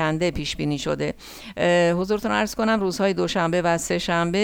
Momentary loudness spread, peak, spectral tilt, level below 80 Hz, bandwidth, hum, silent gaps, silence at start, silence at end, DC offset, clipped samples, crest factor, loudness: 7 LU; -6 dBFS; -5 dB/octave; -44 dBFS; 18 kHz; none; none; 0 s; 0 s; under 0.1%; under 0.1%; 16 dB; -22 LUFS